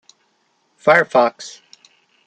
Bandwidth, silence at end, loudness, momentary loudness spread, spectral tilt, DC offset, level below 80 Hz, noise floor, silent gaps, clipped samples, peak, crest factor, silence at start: 9.2 kHz; 0.75 s; -15 LUFS; 22 LU; -4.5 dB/octave; under 0.1%; -70 dBFS; -64 dBFS; none; under 0.1%; -2 dBFS; 18 dB; 0.85 s